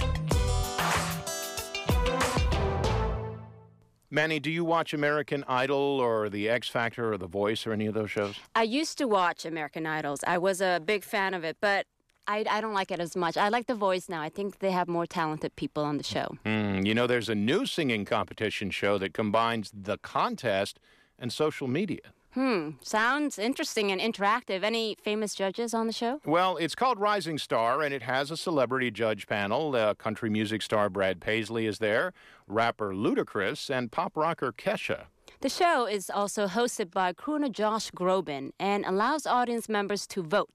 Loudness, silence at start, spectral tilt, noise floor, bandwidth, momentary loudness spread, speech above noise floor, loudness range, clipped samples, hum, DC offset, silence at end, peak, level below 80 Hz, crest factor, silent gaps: -29 LUFS; 0 s; -4.5 dB/octave; -59 dBFS; 15.5 kHz; 6 LU; 30 dB; 2 LU; under 0.1%; none; under 0.1%; 0.1 s; -14 dBFS; -44 dBFS; 14 dB; none